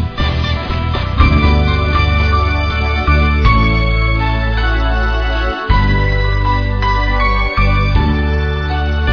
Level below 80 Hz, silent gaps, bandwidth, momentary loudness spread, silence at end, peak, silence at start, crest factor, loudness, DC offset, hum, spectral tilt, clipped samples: -16 dBFS; none; 5.4 kHz; 5 LU; 0 s; 0 dBFS; 0 s; 12 dB; -14 LUFS; under 0.1%; none; -7.5 dB/octave; under 0.1%